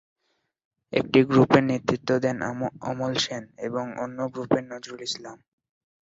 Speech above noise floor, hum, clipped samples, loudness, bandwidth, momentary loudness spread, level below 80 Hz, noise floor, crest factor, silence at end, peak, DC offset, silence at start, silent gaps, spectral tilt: 50 dB; none; under 0.1%; -25 LUFS; 8 kHz; 14 LU; -60 dBFS; -75 dBFS; 22 dB; 0.8 s; -4 dBFS; under 0.1%; 0.9 s; none; -5.5 dB/octave